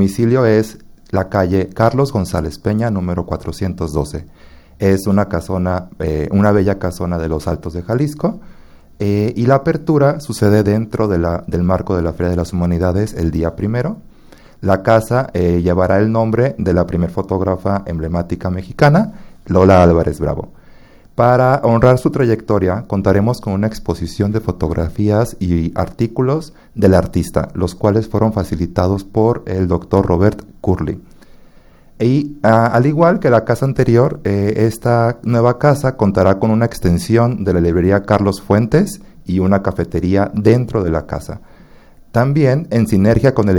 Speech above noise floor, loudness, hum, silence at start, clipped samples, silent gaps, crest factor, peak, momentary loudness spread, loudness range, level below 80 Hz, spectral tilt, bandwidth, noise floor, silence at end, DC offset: 29 dB; -15 LUFS; none; 0 s; under 0.1%; none; 14 dB; 0 dBFS; 9 LU; 4 LU; -34 dBFS; -8 dB/octave; 17.5 kHz; -43 dBFS; 0 s; under 0.1%